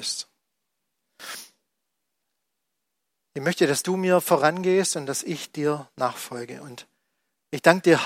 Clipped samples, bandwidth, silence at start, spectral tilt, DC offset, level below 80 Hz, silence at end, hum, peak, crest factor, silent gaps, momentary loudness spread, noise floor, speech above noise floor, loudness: under 0.1%; 16.5 kHz; 0 s; -4 dB/octave; under 0.1%; -74 dBFS; 0 s; none; -2 dBFS; 24 dB; none; 20 LU; -81 dBFS; 58 dB; -23 LUFS